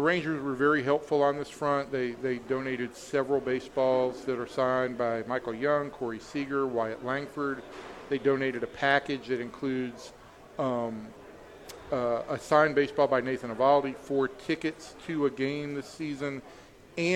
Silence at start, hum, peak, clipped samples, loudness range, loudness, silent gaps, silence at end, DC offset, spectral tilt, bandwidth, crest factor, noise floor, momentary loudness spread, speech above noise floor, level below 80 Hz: 0 s; none; -8 dBFS; under 0.1%; 5 LU; -29 LUFS; none; 0 s; under 0.1%; -6 dB/octave; 13.5 kHz; 20 dB; -48 dBFS; 12 LU; 19 dB; -62 dBFS